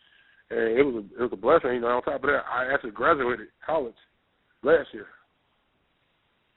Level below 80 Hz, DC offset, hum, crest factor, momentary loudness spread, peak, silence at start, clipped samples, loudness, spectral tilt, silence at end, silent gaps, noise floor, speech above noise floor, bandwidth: -58 dBFS; under 0.1%; none; 22 dB; 10 LU; -6 dBFS; 0.5 s; under 0.1%; -25 LUFS; -3.5 dB/octave; 1.5 s; none; -70 dBFS; 45 dB; 4.1 kHz